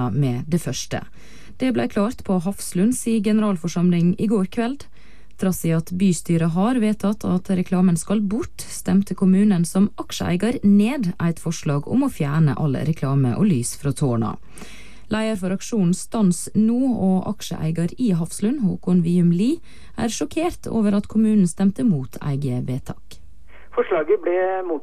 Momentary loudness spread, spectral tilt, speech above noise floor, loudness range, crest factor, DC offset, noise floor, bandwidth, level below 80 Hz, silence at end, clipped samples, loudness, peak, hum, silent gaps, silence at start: 9 LU; -6.5 dB/octave; 27 dB; 3 LU; 12 dB; 2%; -47 dBFS; 14.5 kHz; -48 dBFS; 0 s; under 0.1%; -21 LUFS; -8 dBFS; none; none; 0 s